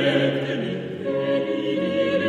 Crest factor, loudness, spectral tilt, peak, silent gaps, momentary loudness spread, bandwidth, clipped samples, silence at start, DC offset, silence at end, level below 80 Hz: 16 dB; -24 LUFS; -7 dB/octave; -8 dBFS; none; 6 LU; 9.8 kHz; under 0.1%; 0 s; under 0.1%; 0 s; -66 dBFS